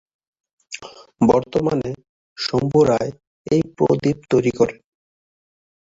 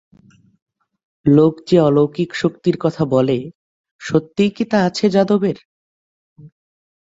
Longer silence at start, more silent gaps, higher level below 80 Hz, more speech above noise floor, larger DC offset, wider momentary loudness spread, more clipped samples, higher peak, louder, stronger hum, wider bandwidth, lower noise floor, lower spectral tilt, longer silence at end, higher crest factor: second, 0.7 s vs 1.25 s; second, 2.09-2.36 s, 3.27-3.45 s vs 3.55-3.84 s, 3.91-3.99 s, 5.65-6.36 s; about the same, -50 dBFS vs -54 dBFS; second, 20 dB vs 35 dB; neither; first, 18 LU vs 9 LU; neither; about the same, -2 dBFS vs -2 dBFS; about the same, -19 LUFS vs -17 LUFS; neither; about the same, 7.8 kHz vs 7.8 kHz; second, -38 dBFS vs -51 dBFS; about the same, -6.5 dB/octave vs -7 dB/octave; first, 1.2 s vs 0.55 s; about the same, 20 dB vs 16 dB